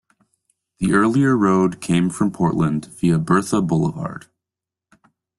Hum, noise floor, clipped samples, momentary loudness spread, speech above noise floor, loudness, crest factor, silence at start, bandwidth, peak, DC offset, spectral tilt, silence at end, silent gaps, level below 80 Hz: none; -87 dBFS; under 0.1%; 8 LU; 69 dB; -19 LUFS; 16 dB; 0.8 s; 12.5 kHz; -4 dBFS; under 0.1%; -7 dB/octave; 1.2 s; none; -52 dBFS